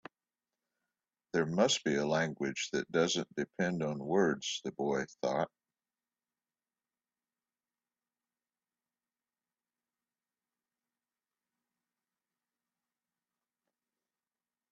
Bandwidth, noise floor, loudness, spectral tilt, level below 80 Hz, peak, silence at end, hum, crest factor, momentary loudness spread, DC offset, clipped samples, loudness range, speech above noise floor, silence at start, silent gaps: 8.4 kHz; under -90 dBFS; -33 LUFS; -4 dB/octave; -76 dBFS; -14 dBFS; 9.25 s; none; 26 dB; 7 LU; under 0.1%; under 0.1%; 9 LU; over 57 dB; 1.35 s; none